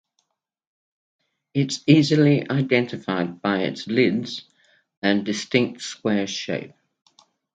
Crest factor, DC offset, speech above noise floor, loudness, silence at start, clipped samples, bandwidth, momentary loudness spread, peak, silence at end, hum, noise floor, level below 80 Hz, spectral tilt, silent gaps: 20 dB; under 0.1%; 52 dB; -22 LUFS; 1.55 s; under 0.1%; 9.2 kHz; 11 LU; -2 dBFS; 0.85 s; none; -73 dBFS; -66 dBFS; -5.5 dB/octave; 4.97-5.02 s